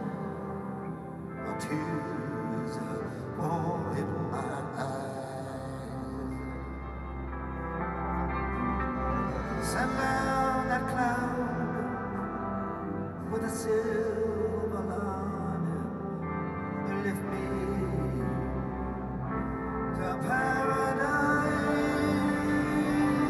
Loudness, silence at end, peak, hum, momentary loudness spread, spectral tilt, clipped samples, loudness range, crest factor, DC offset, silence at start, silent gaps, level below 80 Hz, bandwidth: -32 LUFS; 0 s; -14 dBFS; none; 10 LU; -6.5 dB/octave; under 0.1%; 7 LU; 16 dB; under 0.1%; 0 s; none; -44 dBFS; 13.5 kHz